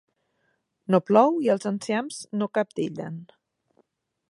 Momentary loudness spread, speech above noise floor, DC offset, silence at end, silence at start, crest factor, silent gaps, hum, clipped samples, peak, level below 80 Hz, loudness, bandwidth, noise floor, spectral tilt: 17 LU; 49 dB; under 0.1%; 1.05 s; 0.9 s; 22 dB; none; none; under 0.1%; -4 dBFS; -76 dBFS; -24 LUFS; 11.5 kHz; -73 dBFS; -6 dB/octave